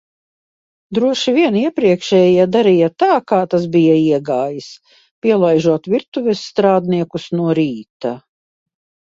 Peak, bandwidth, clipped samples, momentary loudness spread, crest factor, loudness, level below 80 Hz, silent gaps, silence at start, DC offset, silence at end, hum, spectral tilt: 0 dBFS; 7.8 kHz; under 0.1%; 10 LU; 14 dB; -15 LUFS; -58 dBFS; 5.11-5.22 s, 6.08-6.12 s, 7.90-8.00 s; 0.9 s; under 0.1%; 0.85 s; none; -6.5 dB/octave